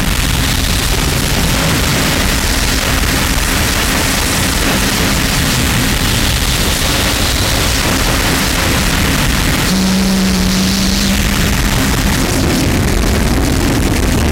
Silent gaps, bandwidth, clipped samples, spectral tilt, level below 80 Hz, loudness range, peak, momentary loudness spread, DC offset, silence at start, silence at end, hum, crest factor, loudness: none; 16.5 kHz; under 0.1%; -3.5 dB/octave; -18 dBFS; 1 LU; 0 dBFS; 1 LU; under 0.1%; 0 s; 0 s; none; 12 dB; -12 LUFS